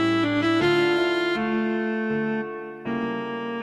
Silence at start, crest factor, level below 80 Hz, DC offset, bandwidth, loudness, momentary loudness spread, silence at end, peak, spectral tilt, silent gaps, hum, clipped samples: 0 s; 12 dB; -58 dBFS; under 0.1%; 11.5 kHz; -24 LUFS; 9 LU; 0 s; -12 dBFS; -6 dB/octave; none; none; under 0.1%